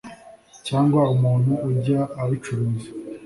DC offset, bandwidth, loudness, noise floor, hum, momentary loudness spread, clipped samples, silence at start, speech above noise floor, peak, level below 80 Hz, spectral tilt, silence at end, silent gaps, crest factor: under 0.1%; 11.5 kHz; -22 LUFS; -47 dBFS; none; 14 LU; under 0.1%; 0.05 s; 27 dB; -6 dBFS; -54 dBFS; -8 dB/octave; 0 s; none; 16 dB